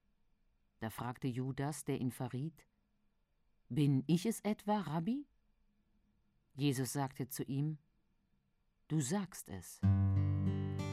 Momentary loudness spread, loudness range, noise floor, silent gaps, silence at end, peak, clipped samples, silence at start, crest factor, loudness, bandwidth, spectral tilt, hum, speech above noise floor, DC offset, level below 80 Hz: 12 LU; 4 LU; -77 dBFS; none; 0 s; -22 dBFS; under 0.1%; 0.8 s; 18 dB; -38 LUFS; 15.5 kHz; -6.5 dB/octave; none; 41 dB; under 0.1%; -70 dBFS